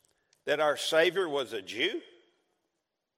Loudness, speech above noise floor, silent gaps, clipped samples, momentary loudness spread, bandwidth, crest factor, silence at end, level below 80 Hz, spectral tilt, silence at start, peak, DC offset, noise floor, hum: -29 LUFS; 55 dB; none; under 0.1%; 12 LU; 16 kHz; 20 dB; 1.15 s; -82 dBFS; -2.5 dB/octave; 0.45 s; -12 dBFS; under 0.1%; -84 dBFS; none